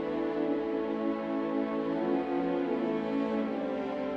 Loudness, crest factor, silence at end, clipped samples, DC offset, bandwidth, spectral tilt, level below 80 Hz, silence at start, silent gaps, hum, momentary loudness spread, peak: -32 LUFS; 14 dB; 0 s; under 0.1%; under 0.1%; 6.2 kHz; -8 dB/octave; -64 dBFS; 0 s; none; none; 2 LU; -18 dBFS